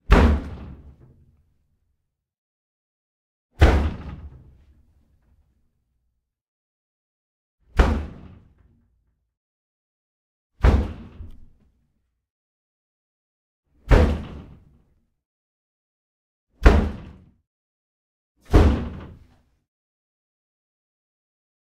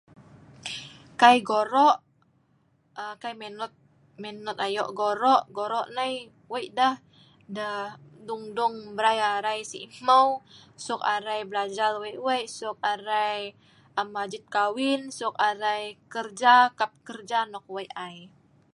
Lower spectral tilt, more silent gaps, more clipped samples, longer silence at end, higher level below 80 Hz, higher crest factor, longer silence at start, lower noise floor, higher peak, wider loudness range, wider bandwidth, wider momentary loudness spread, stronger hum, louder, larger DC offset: first, -7.5 dB/octave vs -3 dB/octave; first, 2.38-3.49 s, 6.48-7.58 s, 9.37-10.50 s, 12.30-13.63 s, 15.26-16.47 s, 17.47-18.35 s vs none; neither; first, 2.65 s vs 0.45 s; first, -28 dBFS vs -76 dBFS; about the same, 26 dB vs 24 dB; second, 0.1 s vs 0.65 s; first, -75 dBFS vs -66 dBFS; about the same, 0 dBFS vs -2 dBFS; about the same, 6 LU vs 5 LU; second, 9.4 kHz vs 11.5 kHz; first, 23 LU vs 18 LU; neither; first, -21 LUFS vs -26 LUFS; neither